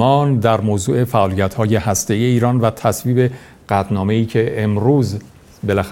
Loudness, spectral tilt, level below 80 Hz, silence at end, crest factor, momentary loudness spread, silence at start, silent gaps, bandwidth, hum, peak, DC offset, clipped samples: -17 LUFS; -6.5 dB/octave; -46 dBFS; 0 s; 16 dB; 5 LU; 0 s; none; 17 kHz; none; 0 dBFS; under 0.1%; under 0.1%